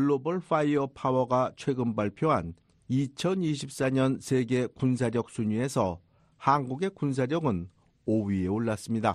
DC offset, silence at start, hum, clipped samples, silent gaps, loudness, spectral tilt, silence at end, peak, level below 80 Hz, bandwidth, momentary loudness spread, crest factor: under 0.1%; 0 s; none; under 0.1%; none; -29 LUFS; -7 dB/octave; 0 s; -10 dBFS; -60 dBFS; 13 kHz; 5 LU; 18 dB